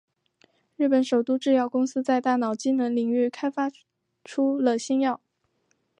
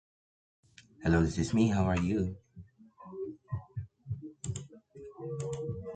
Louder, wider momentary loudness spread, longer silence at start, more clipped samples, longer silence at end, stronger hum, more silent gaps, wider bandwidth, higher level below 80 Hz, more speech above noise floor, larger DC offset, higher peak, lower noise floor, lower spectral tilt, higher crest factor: first, -25 LUFS vs -33 LUFS; second, 5 LU vs 19 LU; second, 0.8 s vs 1 s; neither; first, 0.85 s vs 0 s; neither; neither; about the same, 9.6 kHz vs 9.2 kHz; second, -82 dBFS vs -48 dBFS; first, 48 dB vs 25 dB; neither; first, -10 dBFS vs -16 dBFS; first, -72 dBFS vs -54 dBFS; second, -4.5 dB/octave vs -7 dB/octave; about the same, 16 dB vs 18 dB